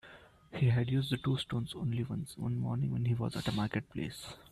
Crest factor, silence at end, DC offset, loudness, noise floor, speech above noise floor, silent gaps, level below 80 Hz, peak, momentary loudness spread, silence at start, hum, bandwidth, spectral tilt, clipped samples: 16 dB; 0.05 s; under 0.1%; -35 LUFS; -57 dBFS; 23 dB; none; -58 dBFS; -18 dBFS; 10 LU; 0.05 s; none; 13 kHz; -6.5 dB/octave; under 0.1%